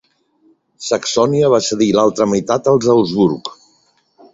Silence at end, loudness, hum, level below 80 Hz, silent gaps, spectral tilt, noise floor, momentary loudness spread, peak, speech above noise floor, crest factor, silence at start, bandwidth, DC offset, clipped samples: 0.8 s; -15 LUFS; none; -54 dBFS; none; -5 dB/octave; -58 dBFS; 8 LU; 0 dBFS; 44 dB; 16 dB; 0.8 s; 8 kHz; under 0.1%; under 0.1%